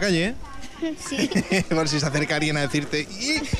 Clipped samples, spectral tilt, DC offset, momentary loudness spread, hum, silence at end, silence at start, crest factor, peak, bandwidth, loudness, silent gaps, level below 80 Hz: under 0.1%; -4.5 dB/octave; under 0.1%; 9 LU; none; 0 s; 0 s; 14 dB; -10 dBFS; 14.5 kHz; -24 LUFS; none; -42 dBFS